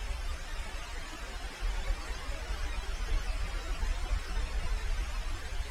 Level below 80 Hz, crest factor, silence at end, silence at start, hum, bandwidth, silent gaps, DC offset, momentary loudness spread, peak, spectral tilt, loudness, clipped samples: -34 dBFS; 14 dB; 0 s; 0 s; none; 14 kHz; none; under 0.1%; 5 LU; -20 dBFS; -3.5 dB/octave; -39 LUFS; under 0.1%